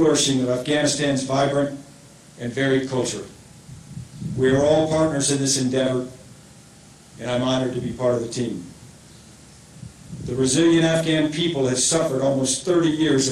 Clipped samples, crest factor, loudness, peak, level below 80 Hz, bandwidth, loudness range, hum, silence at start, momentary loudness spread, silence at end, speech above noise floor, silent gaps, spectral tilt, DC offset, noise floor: under 0.1%; 16 dB; -21 LUFS; -6 dBFS; -52 dBFS; 15.5 kHz; 7 LU; none; 0 s; 18 LU; 0 s; 27 dB; none; -4 dB/octave; under 0.1%; -47 dBFS